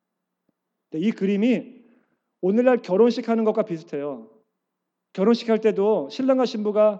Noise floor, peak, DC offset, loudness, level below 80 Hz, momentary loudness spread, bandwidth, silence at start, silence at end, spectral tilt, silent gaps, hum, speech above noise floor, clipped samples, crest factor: -81 dBFS; -6 dBFS; under 0.1%; -22 LUFS; under -90 dBFS; 11 LU; 7.8 kHz; 0.95 s; 0 s; -7 dB/octave; none; none; 60 dB; under 0.1%; 18 dB